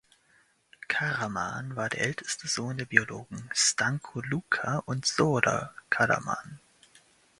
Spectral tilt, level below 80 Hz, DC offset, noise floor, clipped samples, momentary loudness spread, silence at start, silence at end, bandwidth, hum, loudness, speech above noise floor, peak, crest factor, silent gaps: -3 dB/octave; -64 dBFS; under 0.1%; -66 dBFS; under 0.1%; 10 LU; 0.9 s; 0.8 s; 11.5 kHz; none; -28 LUFS; 36 dB; -2 dBFS; 28 dB; none